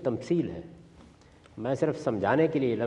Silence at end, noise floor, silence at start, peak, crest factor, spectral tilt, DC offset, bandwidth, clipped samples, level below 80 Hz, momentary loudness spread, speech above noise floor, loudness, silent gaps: 0 s; -55 dBFS; 0 s; -12 dBFS; 18 dB; -7.5 dB/octave; under 0.1%; 9.8 kHz; under 0.1%; -62 dBFS; 19 LU; 28 dB; -28 LUFS; none